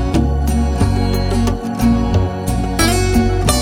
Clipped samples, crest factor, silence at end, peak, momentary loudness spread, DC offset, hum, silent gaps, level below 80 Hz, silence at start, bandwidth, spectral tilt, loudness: under 0.1%; 14 dB; 0 s; 0 dBFS; 4 LU; under 0.1%; none; none; -20 dBFS; 0 s; 18 kHz; -5.5 dB/octave; -16 LUFS